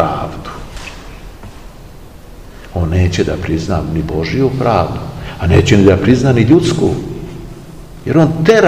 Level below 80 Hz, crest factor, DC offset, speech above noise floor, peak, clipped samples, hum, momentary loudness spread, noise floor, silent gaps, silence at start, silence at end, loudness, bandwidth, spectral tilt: -30 dBFS; 14 dB; 0.8%; 23 dB; 0 dBFS; 0.5%; none; 23 LU; -34 dBFS; none; 0 s; 0 s; -13 LUFS; 15 kHz; -7 dB/octave